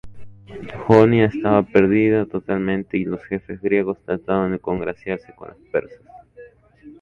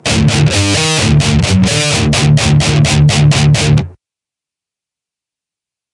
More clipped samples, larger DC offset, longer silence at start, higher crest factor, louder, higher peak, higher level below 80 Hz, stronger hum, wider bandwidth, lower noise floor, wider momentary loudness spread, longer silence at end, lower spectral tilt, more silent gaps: neither; neither; about the same, 0.05 s vs 0.05 s; first, 20 dB vs 12 dB; second, -20 LUFS vs -10 LUFS; about the same, 0 dBFS vs 0 dBFS; second, -48 dBFS vs -28 dBFS; neither; second, 7 kHz vs 11.5 kHz; second, -46 dBFS vs -86 dBFS; first, 14 LU vs 2 LU; second, 0.1 s vs 2 s; first, -9 dB/octave vs -4.5 dB/octave; neither